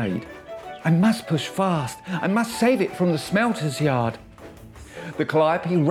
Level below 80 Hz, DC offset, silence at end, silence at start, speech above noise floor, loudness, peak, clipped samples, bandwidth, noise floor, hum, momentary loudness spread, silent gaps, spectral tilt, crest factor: -54 dBFS; under 0.1%; 0 s; 0 s; 21 dB; -22 LUFS; -8 dBFS; under 0.1%; 15.5 kHz; -43 dBFS; none; 18 LU; none; -6.5 dB/octave; 14 dB